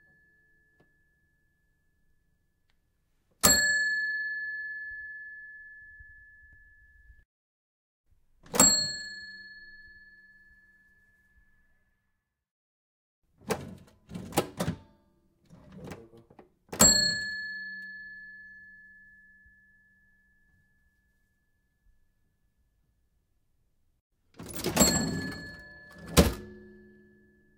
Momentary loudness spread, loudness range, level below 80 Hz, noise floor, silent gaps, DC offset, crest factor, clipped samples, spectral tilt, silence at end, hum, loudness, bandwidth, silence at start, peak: 28 LU; 17 LU; -50 dBFS; -79 dBFS; 7.25-8.04 s, 12.51-13.22 s, 24.01-24.10 s; under 0.1%; 30 dB; under 0.1%; -2 dB/octave; 0.85 s; none; -26 LUFS; 16 kHz; 3.45 s; -4 dBFS